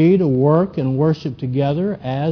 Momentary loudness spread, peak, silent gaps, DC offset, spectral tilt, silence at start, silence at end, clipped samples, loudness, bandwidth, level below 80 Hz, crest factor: 7 LU; -2 dBFS; none; under 0.1%; -10 dB/octave; 0 s; 0 s; under 0.1%; -18 LUFS; 5.4 kHz; -50 dBFS; 14 dB